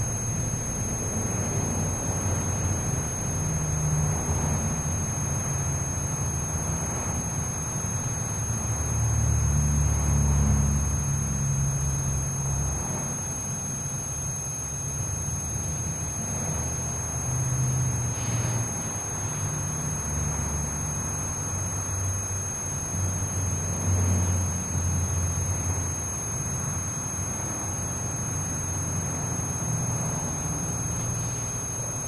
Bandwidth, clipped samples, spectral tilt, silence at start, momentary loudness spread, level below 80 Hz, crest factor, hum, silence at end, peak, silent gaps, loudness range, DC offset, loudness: 11 kHz; under 0.1%; -4.5 dB/octave; 0 s; 5 LU; -36 dBFS; 16 dB; none; 0 s; -12 dBFS; none; 3 LU; under 0.1%; -27 LUFS